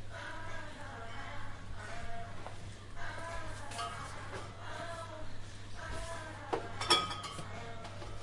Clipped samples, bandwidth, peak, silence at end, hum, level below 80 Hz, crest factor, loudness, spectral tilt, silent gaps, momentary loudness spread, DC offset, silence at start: under 0.1%; 11.5 kHz; -12 dBFS; 0 s; none; -50 dBFS; 26 dB; -41 LUFS; -3 dB/octave; none; 10 LU; under 0.1%; 0 s